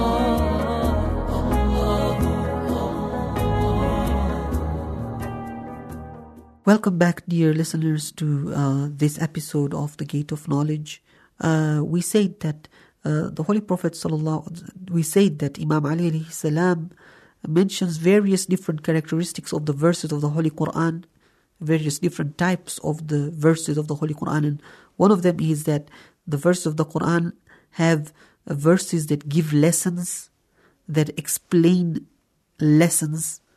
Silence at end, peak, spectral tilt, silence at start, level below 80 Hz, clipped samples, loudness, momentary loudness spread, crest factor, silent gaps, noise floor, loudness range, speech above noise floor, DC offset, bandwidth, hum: 0.2 s; -4 dBFS; -6 dB/octave; 0 s; -36 dBFS; under 0.1%; -22 LUFS; 11 LU; 18 dB; none; -61 dBFS; 3 LU; 40 dB; under 0.1%; 14 kHz; none